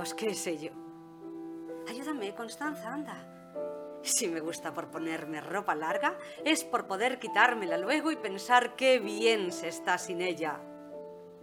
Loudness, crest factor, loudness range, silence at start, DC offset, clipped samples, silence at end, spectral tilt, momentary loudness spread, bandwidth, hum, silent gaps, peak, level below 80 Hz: -31 LUFS; 24 dB; 10 LU; 0 s; under 0.1%; under 0.1%; 0 s; -2.5 dB/octave; 18 LU; 20 kHz; none; none; -8 dBFS; -78 dBFS